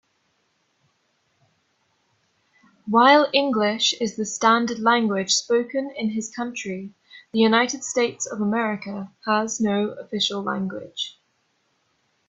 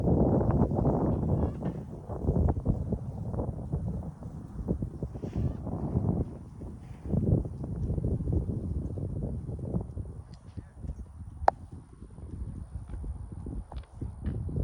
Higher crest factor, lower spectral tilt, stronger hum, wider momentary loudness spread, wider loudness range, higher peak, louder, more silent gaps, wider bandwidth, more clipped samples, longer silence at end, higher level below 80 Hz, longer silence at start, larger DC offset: second, 22 dB vs 28 dB; second, -3 dB/octave vs -10.5 dB/octave; neither; second, 13 LU vs 16 LU; about the same, 6 LU vs 6 LU; about the same, -2 dBFS vs -4 dBFS; first, -22 LUFS vs -32 LUFS; neither; second, 8.4 kHz vs 10.5 kHz; neither; first, 1.15 s vs 0 s; second, -70 dBFS vs -38 dBFS; first, 2.85 s vs 0 s; neither